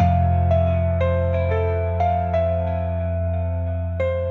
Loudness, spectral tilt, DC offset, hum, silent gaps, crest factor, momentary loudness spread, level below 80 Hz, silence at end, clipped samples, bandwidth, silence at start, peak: -22 LUFS; -10 dB/octave; under 0.1%; none; none; 14 dB; 6 LU; -38 dBFS; 0 s; under 0.1%; 4.2 kHz; 0 s; -6 dBFS